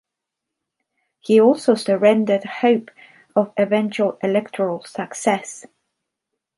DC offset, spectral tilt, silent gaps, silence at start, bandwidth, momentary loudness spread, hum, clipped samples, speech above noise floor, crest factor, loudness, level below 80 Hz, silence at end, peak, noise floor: under 0.1%; -5.5 dB/octave; none; 1.3 s; 11.5 kHz; 12 LU; none; under 0.1%; 64 dB; 18 dB; -19 LUFS; -70 dBFS; 0.95 s; -2 dBFS; -83 dBFS